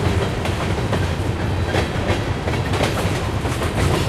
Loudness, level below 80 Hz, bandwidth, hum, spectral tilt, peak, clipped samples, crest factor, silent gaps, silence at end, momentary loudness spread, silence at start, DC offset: -21 LUFS; -30 dBFS; 14.5 kHz; none; -5.5 dB/octave; -4 dBFS; under 0.1%; 16 dB; none; 0 s; 2 LU; 0 s; under 0.1%